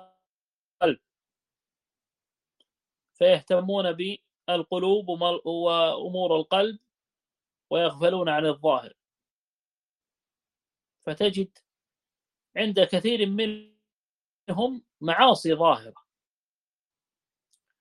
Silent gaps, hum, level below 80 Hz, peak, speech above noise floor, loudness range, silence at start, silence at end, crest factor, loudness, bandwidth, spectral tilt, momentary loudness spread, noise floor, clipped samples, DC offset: 9.31-10.00 s, 13.96-14.45 s; none; -72 dBFS; -4 dBFS; over 66 dB; 6 LU; 0.8 s; 1.9 s; 24 dB; -25 LUFS; 11.5 kHz; -5.5 dB/octave; 12 LU; under -90 dBFS; under 0.1%; under 0.1%